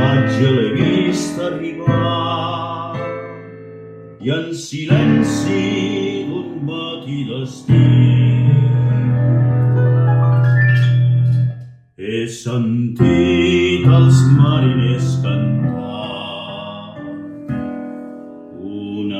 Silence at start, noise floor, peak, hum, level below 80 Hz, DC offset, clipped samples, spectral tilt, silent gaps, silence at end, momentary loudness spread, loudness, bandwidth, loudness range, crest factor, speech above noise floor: 0 s; -35 dBFS; 0 dBFS; none; -48 dBFS; under 0.1%; under 0.1%; -7 dB/octave; none; 0 s; 18 LU; -16 LUFS; 9.2 kHz; 8 LU; 16 dB; 19 dB